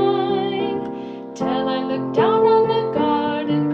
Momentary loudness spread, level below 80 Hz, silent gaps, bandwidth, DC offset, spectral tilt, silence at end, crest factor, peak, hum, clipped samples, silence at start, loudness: 11 LU; -60 dBFS; none; 7.2 kHz; under 0.1%; -7 dB/octave; 0 s; 14 dB; -6 dBFS; none; under 0.1%; 0 s; -20 LUFS